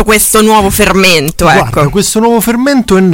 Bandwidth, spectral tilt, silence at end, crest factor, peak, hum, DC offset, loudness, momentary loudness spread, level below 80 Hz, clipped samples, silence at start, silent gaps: 17.5 kHz; -4 dB/octave; 0 s; 8 dB; 0 dBFS; none; under 0.1%; -7 LUFS; 4 LU; -26 dBFS; 1%; 0 s; none